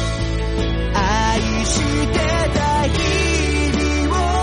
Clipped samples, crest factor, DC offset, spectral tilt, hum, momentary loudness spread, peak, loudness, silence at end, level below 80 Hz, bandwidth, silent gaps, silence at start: under 0.1%; 12 dB; under 0.1%; -4.5 dB/octave; none; 4 LU; -6 dBFS; -18 LUFS; 0 s; -22 dBFS; 10.5 kHz; none; 0 s